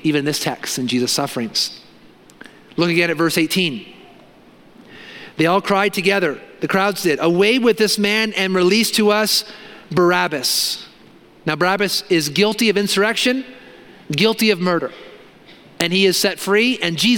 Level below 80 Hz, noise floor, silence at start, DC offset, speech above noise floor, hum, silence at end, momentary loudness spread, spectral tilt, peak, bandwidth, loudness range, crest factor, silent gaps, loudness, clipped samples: -62 dBFS; -47 dBFS; 0.05 s; under 0.1%; 29 dB; none; 0 s; 10 LU; -3.5 dB/octave; 0 dBFS; 17.5 kHz; 5 LU; 18 dB; none; -17 LUFS; under 0.1%